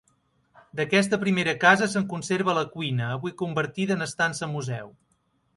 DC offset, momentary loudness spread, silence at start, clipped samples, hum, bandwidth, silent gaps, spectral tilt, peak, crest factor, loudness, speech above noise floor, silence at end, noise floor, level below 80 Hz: under 0.1%; 12 LU; 0.75 s; under 0.1%; none; 11.5 kHz; none; -5 dB/octave; -4 dBFS; 22 dB; -25 LUFS; 44 dB; 0.65 s; -69 dBFS; -66 dBFS